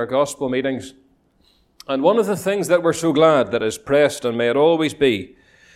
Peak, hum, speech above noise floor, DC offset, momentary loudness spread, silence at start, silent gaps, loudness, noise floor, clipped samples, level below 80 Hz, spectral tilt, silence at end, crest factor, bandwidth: -2 dBFS; none; 41 dB; under 0.1%; 9 LU; 0 s; none; -18 LUFS; -59 dBFS; under 0.1%; -56 dBFS; -5 dB/octave; 0.5 s; 16 dB; 15.5 kHz